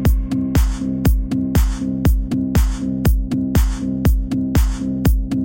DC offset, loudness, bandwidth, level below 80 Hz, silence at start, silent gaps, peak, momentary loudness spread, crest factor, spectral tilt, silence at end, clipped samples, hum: under 0.1%; -19 LUFS; 17 kHz; -20 dBFS; 0 s; none; -4 dBFS; 2 LU; 14 dB; -7 dB/octave; 0 s; under 0.1%; none